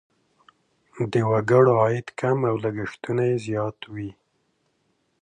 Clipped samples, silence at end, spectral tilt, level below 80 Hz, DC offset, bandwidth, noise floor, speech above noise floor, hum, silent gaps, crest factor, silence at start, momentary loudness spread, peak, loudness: under 0.1%; 1.1 s; -8 dB/octave; -62 dBFS; under 0.1%; 10 kHz; -70 dBFS; 48 dB; none; none; 20 dB; 0.95 s; 17 LU; -4 dBFS; -23 LUFS